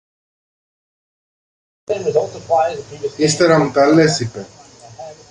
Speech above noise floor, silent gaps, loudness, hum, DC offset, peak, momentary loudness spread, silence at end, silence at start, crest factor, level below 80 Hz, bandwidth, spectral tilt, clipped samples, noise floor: 21 dB; none; -16 LUFS; none; under 0.1%; -2 dBFS; 21 LU; 0.15 s; 1.9 s; 16 dB; -54 dBFS; 11.5 kHz; -5 dB/octave; under 0.1%; -36 dBFS